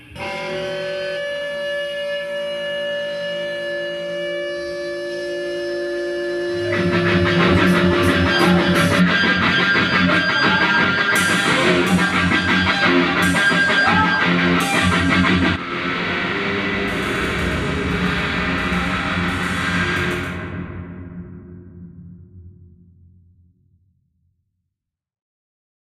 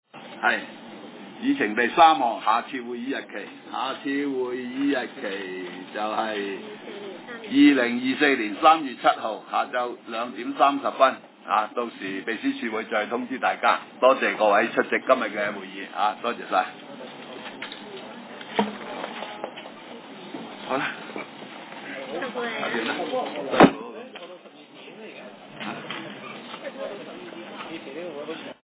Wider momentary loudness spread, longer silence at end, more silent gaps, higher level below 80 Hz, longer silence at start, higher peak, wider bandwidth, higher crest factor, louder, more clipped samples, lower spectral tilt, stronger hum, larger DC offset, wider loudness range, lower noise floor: second, 10 LU vs 20 LU; first, 3.25 s vs 0.15 s; neither; first, -42 dBFS vs -68 dBFS; second, 0 s vs 0.15 s; about the same, -2 dBFS vs -2 dBFS; first, 15 kHz vs 4 kHz; second, 18 dB vs 24 dB; first, -18 LUFS vs -24 LUFS; neither; second, -5 dB/octave vs -8.5 dB/octave; neither; neither; about the same, 10 LU vs 12 LU; first, -80 dBFS vs -46 dBFS